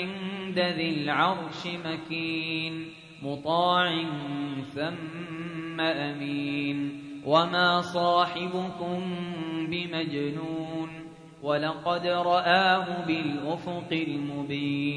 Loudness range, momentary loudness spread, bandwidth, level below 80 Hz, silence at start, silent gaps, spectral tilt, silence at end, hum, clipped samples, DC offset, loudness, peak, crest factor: 5 LU; 12 LU; 10.5 kHz; -66 dBFS; 0 s; none; -6 dB/octave; 0 s; none; under 0.1%; under 0.1%; -28 LUFS; -8 dBFS; 22 dB